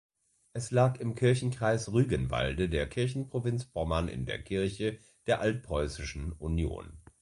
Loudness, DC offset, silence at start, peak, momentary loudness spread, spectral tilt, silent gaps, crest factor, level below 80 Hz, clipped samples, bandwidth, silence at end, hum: -31 LUFS; under 0.1%; 0.55 s; -12 dBFS; 10 LU; -6 dB/octave; none; 20 dB; -44 dBFS; under 0.1%; 11.5 kHz; 0.2 s; none